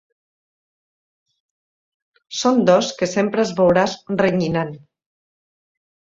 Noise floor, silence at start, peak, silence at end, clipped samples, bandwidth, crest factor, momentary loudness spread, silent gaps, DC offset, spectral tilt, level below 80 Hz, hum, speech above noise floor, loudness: under -90 dBFS; 2.3 s; -2 dBFS; 1.35 s; under 0.1%; 7.8 kHz; 20 dB; 8 LU; none; under 0.1%; -5 dB/octave; -56 dBFS; none; over 72 dB; -18 LUFS